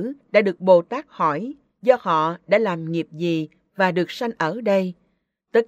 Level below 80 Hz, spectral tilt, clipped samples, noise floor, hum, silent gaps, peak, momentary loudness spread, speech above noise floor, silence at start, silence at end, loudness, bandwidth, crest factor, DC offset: -70 dBFS; -7 dB/octave; under 0.1%; -69 dBFS; none; none; -2 dBFS; 10 LU; 49 dB; 0 s; 0.05 s; -21 LUFS; 13.5 kHz; 20 dB; under 0.1%